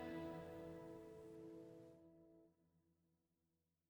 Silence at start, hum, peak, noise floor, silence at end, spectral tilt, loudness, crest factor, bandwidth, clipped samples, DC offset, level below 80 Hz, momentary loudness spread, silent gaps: 0 s; none; -40 dBFS; -89 dBFS; 1.1 s; -7 dB/octave; -56 LUFS; 16 dB; 18 kHz; under 0.1%; under 0.1%; -80 dBFS; 16 LU; none